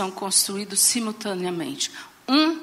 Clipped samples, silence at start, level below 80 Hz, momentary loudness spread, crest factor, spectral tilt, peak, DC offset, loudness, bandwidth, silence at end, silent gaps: under 0.1%; 0 s; -72 dBFS; 10 LU; 18 dB; -2 dB/octave; -6 dBFS; under 0.1%; -22 LUFS; 16 kHz; 0 s; none